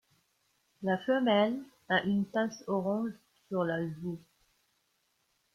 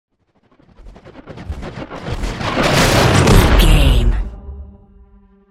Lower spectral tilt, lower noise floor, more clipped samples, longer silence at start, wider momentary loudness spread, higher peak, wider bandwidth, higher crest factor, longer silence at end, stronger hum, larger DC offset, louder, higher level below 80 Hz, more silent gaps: first, -6.5 dB/octave vs -5 dB/octave; first, -76 dBFS vs -57 dBFS; neither; about the same, 0.8 s vs 0.85 s; second, 13 LU vs 23 LU; second, -14 dBFS vs 0 dBFS; second, 11.5 kHz vs 16 kHz; about the same, 20 dB vs 16 dB; first, 1.35 s vs 0.85 s; neither; neither; second, -32 LUFS vs -14 LUFS; second, -74 dBFS vs -18 dBFS; neither